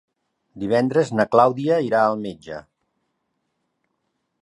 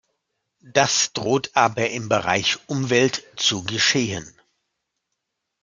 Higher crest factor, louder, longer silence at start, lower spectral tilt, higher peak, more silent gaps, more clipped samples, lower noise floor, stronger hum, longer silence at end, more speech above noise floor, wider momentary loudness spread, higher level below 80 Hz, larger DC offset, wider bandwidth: about the same, 22 dB vs 22 dB; about the same, -19 LUFS vs -20 LUFS; about the same, 0.55 s vs 0.65 s; first, -7 dB/octave vs -3 dB/octave; about the same, 0 dBFS vs 0 dBFS; neither; neither; second, -74 dBFS vs -79 dBFS; neither; first, 1.8 s vs 1.35 s; about the same, 55 dB vs 58 dB; first, 18 LU vs 5 LU; about the same, -62 dBFS vs -62 dBFS; neither; about the same, 11 kHz vs 11 kHz